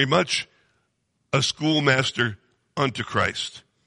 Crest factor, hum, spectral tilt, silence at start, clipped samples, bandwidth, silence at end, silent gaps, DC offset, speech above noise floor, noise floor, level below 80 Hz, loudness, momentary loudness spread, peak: 18 dB; none; -4 dB/octave; 0 s; under 0.1%; 11 kHz; 0.3 s; none; under 0.1%; 50 dB; -72 dBFS; -60 dBFS; -23 LUFS; 11 LU; -6 dBFS